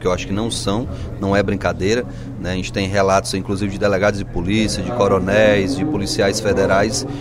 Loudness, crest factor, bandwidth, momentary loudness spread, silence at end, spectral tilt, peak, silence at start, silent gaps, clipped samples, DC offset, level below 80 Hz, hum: -18 LUFS; 16 dB; 15.5 kHz; 9 LU; 0 s; -5 dB/octave; -2 dBFS; 0 s; none; under 0.1%; under 0.1%; -34 dBFS; none